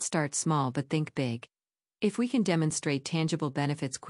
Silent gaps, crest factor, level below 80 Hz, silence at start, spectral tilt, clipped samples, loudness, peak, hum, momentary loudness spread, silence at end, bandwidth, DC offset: none; 18 dB; -72 dBFS; 0 s; -5 dB/octave; under 0.1%; -30 LUFS; -12 dBFS; none; 5 LU; 0 s; 11.5 kHz; under 0.1%